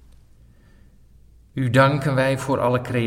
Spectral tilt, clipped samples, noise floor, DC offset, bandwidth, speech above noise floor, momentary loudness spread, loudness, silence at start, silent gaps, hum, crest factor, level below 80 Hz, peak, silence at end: -6.5 dB/octave; under 0.1%; -51 dBFS; under 0.1%; 14 kHz; 31 dB; 8 LU; -20 LUFS; 1.55 s; none; none; 20 dB; -50 dBFS; -4 dBFS; 0 s